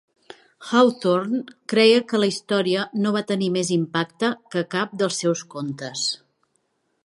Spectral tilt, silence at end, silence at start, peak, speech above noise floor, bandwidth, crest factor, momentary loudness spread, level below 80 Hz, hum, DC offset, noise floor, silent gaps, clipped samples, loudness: -4.5 dB/octave; 0.9 s; 0.6 s; -2 dBFS; 49 dB; 11.5 kHz; 20 dB; 10 LU; -72 dBFS; none; under 0.1%; -70 dBFS; none; under 0.1%; -22 LUFS